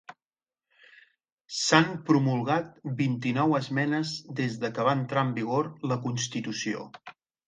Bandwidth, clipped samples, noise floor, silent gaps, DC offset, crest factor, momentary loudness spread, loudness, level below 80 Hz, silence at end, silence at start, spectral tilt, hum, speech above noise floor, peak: 9.6 kHz; under 0.1%; under -90 dBFS; 1.32-1.38 s; under 0.1%; 24 dB; 10 LU; -28 LUFS; -70 dBFS; 0.35 s; 0.1 s; -5 dB/octave; none; over 63 dB; -4 dBFS